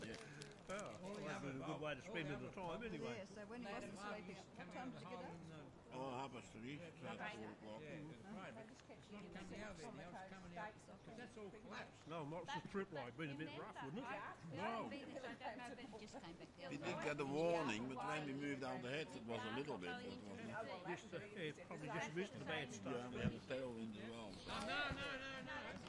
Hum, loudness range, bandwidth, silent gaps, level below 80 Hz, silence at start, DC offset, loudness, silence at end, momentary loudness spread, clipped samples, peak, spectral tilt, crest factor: none; 9 LU; 11 kHz; none; -74 dBFS; 0 s; under 0.1%; -50 LUFS; 0 s; 11 LU; under 0.1%; -30 dBFS; -5 dB/octave; 20 dB